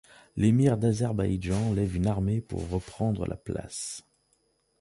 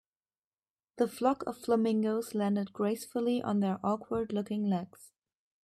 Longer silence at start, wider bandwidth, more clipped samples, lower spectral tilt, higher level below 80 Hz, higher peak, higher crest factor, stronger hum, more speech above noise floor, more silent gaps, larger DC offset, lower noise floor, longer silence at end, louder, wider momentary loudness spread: second, 0.35 s vs 0.95 s; second, 11.5 kHz vs 14 kHz; neither; about the same, -7 dB/octave vs -7 dB/octave; first, -44 dBFS vs -72 dBFS; about the same, -12 dBFS vs -14 dBFS; about the same, 16 dB vs 18 dB; neither; second, 44 dB vs over 59 dB; neither; neither; second, -71 dBFS vs under -90 dBFS; first, 0.8 s vs 0.55 s; first, -28 LUFS vs -32 LUFS; first, 12 LU vs 5 LU